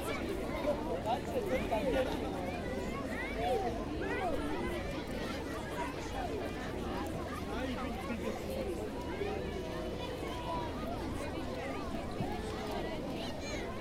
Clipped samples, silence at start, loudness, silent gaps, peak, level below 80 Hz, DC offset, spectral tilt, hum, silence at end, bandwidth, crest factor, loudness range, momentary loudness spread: under 0.1%; 0 s; -38 LUFS; none; -22 dBFS; -48 dBFS; under 0.1%; -5.5 dB/octave; none; 0 s; 16 kHz; 16 dB; 3 LU; 5 LU